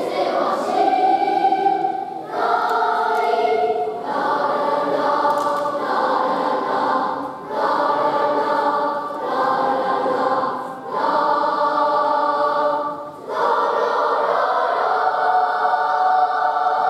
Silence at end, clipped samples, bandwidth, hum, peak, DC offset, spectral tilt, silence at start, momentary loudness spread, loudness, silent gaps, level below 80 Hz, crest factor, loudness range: 0 s; under 0.1%; 13.5 kHz; none; -6 dBFS; under 0.1%; -4.5 dB/octave; 0 s; 6 LU; -19 LUFS; none; -68 dBFS; 14 dB; 1 LU